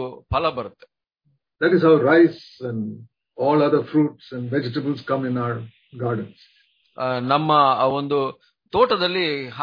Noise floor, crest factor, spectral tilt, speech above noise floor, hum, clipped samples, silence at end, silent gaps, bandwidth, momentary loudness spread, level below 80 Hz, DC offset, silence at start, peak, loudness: -68 dBFS; 18 dB; -8.5 dB/octave; 48 dB; none; under 0.1%; 0 s; none; 5.2 kHz; 16 LU; -50 dBFS; under 0.1%; 0 s; -4 dBFS; -21 LUFS